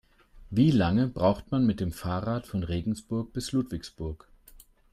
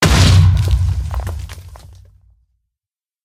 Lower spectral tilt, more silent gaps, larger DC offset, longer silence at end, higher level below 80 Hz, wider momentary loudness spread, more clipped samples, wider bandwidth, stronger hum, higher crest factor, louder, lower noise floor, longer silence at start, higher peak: first, -7 dB/octave vs -5 dB/octave; neither; neither; second, 0.75 s vs 1.35 s; second, -48 dBFS vs -22 dBFS; second, 13 LU vs 21 LU; neither; about the same, 15 kHz vs 15 kHz; neither; about the same, 18 dB vs 16 dB; second, -28 LUFS vs -14 LUFS; second, -55 dBFS vs -90 dBFS; first, 0.35 s vs 0 s; second, -12 dBFS vs 0 dBFS